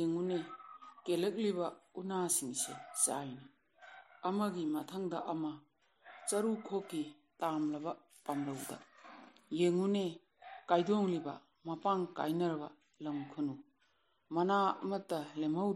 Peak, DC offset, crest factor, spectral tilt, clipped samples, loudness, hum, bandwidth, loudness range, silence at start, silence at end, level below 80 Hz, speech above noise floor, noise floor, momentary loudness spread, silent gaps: -16 dBFS; under 0.1%; 22 dB; -4.5 dB/octave; under 0.1%; -37 LUFS; none; 13.5 kHz; 4 LU; 0 s; 0 s; -88 dBFS; 40 dB; -76 dBFS; 18 LU; none